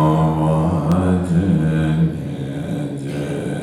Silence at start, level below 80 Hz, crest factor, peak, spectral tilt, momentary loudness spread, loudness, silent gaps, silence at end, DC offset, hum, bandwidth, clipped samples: 0 s; -38 dBFS; 12 dB; -4 dBFS; -8.5 dB/octave; 8 LU; -19 LUFS; none; 0 s; under 0.1%; none; 11 kHz; under 0.1%